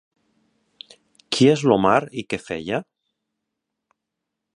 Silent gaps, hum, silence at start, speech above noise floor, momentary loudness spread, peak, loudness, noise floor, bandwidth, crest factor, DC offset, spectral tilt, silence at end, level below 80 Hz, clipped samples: none; none; 1.3 s; 63 dB; 12 LU; -2 dBFS; -20 LUFS; -82 dBFS; 11.5 kHz; 22 dB; under 0.1%; -5.5 dB/octave; 1.75 s; -58 dBFS; under 0.1%